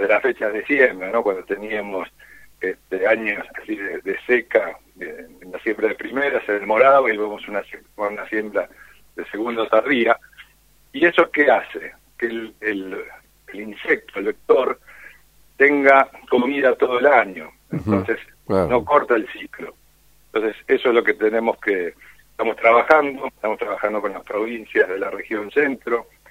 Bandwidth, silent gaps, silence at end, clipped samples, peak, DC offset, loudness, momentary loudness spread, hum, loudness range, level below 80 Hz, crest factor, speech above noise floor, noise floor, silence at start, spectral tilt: 16 kHz; none; 0.3 s; under 0.1%; 0 dBFS; under 0.1%; -20 LUFS; 17 LU; none; 5 LU; -56 dBFS; 20 dB; 36 dB; -55 dBFS; 0 s; -6.5 dB/octave